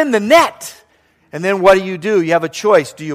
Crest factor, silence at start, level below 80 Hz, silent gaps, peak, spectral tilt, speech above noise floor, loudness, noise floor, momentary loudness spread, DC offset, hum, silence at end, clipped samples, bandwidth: 14 dB; 0 s; -52 dBFS; none; 0 dBFS; -4.5 dB/octave; 42 dB; -13 LUFS; -55 dBFS; 17 LU; under 0.1%; none; 0 s; under 0.1%; 15.5 kHz